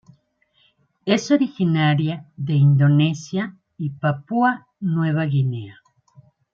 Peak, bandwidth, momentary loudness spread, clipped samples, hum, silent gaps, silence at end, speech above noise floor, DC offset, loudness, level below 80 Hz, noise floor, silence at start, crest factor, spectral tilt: -4 dBFS; 7.4 kHz; 14 LU; under 0.1%; none; none; 0.8 s; 44 dB; under 0.1%; -20 LUFS; -66 dBFS; -63 dBFS; 1.05 s; 16 dB; -7 dB/octave